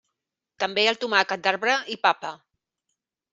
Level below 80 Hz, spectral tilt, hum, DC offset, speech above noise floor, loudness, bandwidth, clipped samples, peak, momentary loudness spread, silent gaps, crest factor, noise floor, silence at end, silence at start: -76 dBFS; -2 dB/octave; none; under 0.1%; 60 dB; -23 LUFS; 8 kHz; under 0.1%; -2 dBFS; 9 LU; none; 24 dB; -84 dBFS; 1 s; 0.6 s